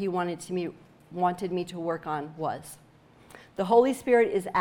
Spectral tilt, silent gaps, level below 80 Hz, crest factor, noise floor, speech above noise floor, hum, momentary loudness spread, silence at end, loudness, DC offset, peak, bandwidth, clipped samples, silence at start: -6 dB/octave; none; -68 dBFS; 20 dB; -54 dBFS; 27 dB; none; 16 LU; 0 s; -27 LUFS; under 0.1%; -8 dBFS; 16.5 kHz; under 0.1%; 0 s